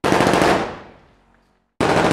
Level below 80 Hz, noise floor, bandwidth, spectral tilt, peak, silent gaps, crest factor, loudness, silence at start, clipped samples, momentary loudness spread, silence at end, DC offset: -42 dBFS; -60 dBFS; 16 kHz; -5 dB/octave; 0 dBFS; none; 18 dB; -18 LUFS; 0.05 s; under 0.1%; 14 LU; 0 s; under 0.1%